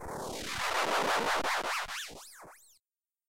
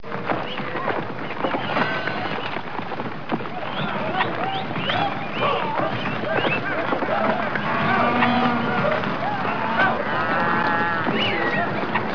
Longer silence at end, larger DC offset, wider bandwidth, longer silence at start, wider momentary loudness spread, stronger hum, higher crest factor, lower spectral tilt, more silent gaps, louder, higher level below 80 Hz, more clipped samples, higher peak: about the same, 0 s vs 0 s; second, under 0.1% vs 2%; first, 16 kHz vs 5.4 kHz; about the same, 0 s vs 0 s; first, 18 LU vs 8 LU; neither; about the same, 16 dB vs 16 dB; second, -1.5 dB/octave vs -6.5 dB/octave; neither; second, -32 LUFS vs -23 LUFS; about the same, -60 dBFS vs -58 dBFS; neither; second, -20 dBFS vs -6 dBFS